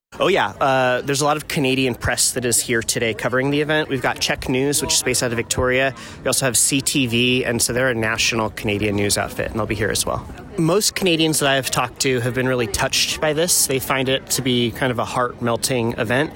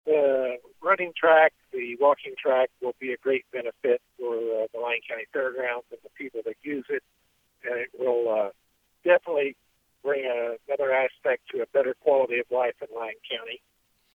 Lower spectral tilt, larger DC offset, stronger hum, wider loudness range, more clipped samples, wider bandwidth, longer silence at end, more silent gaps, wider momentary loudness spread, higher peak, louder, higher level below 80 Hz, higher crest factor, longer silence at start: second, -3 dB/octave vs -5.5 dB/octave; neither; neither; second, 1 LU vs 7 LU; neither; first, 17 kHz vs 4 kHz; second, 0 s vs 0.6 s; neither; second, 5 LU vs 12 LU; about the same, -4 dBFS vs -6 dBFS; first, -19 LUFS vs -26 LUFS; first, -42 dBFS vs -78 dBFS; about the same, 16 dB vs 20 dB; about the same, 0.1 s vs 0.05 s